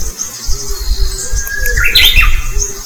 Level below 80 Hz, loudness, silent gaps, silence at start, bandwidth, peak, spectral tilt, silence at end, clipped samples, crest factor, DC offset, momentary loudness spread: -14 dBFS; -12 LUFS; none; 0 s; over 20 kHz; 0 dBFS; -0.5 dB/octave; 0 s; 1%; 12 dB; under 0.1%; 14 LU